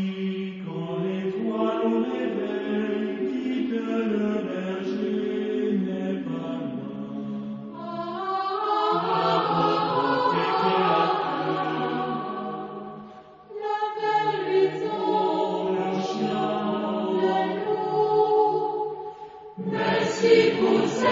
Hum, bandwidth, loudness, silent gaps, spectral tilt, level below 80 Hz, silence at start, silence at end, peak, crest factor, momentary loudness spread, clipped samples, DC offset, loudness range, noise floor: none; 7.6 kHz; -25 LUFS; none; -6 dB/octave; -66 dBFS; 0 s; 0 s; -6 dBFS; 20 dB; 12 LU; under 0.1%; under 0.1%; 6 LU; -45 dBFS